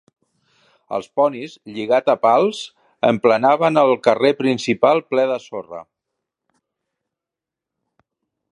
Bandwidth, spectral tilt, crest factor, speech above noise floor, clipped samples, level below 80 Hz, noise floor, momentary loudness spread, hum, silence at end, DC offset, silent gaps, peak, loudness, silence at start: 11 kHz; -5.5 dB/octave; 20 dB; 69 dB; under 0.1%; -70 dBFS; -86 dBFS; 16 LU; none; 2.7 s; under 0.1%; none; 0 dBFS; -17 LUFS; 0.9 s